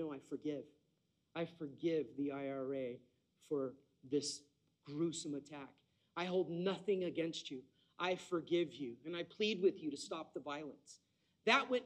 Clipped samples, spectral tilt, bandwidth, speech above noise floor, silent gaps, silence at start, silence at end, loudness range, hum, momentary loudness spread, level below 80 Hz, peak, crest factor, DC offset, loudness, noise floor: under 0.1%; -4.5 dB/octave; 11.5 kHz; 41 dB; none; 0 s; 0 s; 4 LU; none; 14 LU; -86 dBFS; -18 dBFS; 24 dB; under 0.1%; -41 LUFS; -81 dBFS